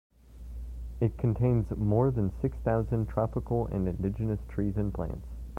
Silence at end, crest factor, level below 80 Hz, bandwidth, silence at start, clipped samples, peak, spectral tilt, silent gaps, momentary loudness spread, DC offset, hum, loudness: 0 s; 16 dB; -40 dBFS; 3.1 kHz; 0.25 s; under 0.1%; -12 dBFS; -11 dB/octave; none; 15 LU; under 0.1%; none; -30 LUFS